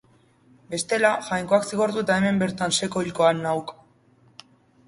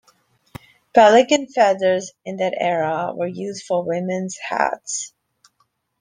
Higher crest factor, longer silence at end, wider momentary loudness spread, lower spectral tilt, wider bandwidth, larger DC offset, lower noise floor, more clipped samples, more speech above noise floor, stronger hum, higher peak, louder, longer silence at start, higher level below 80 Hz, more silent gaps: about the same, 20 dB vs 18 dB; first, 1.15 s vs 0.9 s; second, 8 LU vs 14 LU; about the same, -4 dB/octave vs -4 dB/octave; first, 11.5 kHz vs 10 kHz; neither; second, -58 dBFS vs -67 dBFS; neither; second, 35 dB vs 48 dB; neither; second, -6 dBFS vs -2 dBFS; second, -23 LUFS vs -19 LUFS; second, 0.7 s vs 0.95 s; about the same, -60 dBFS vs -62 dBFS; neither